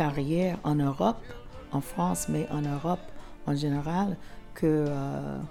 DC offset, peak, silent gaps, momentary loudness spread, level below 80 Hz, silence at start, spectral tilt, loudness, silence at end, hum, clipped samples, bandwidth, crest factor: under 0.1%; -14 dBFS; none; 13 LU; -48 dBFS; 0 s; -6.5 dB/octave; -30 LUFS; 0 s; none; under 0.1%; 17 kHz; 16 dB